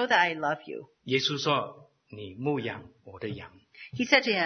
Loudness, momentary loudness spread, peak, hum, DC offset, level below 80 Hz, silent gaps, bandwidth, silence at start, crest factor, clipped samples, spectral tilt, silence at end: -28 LUFS; 21 LU; -4 dBFS; none; under 0.1%; -70 dBFS; none; 6.6 kHz; 0 s; 24 dB; under 0.1%; -4 dB/octave; 0 s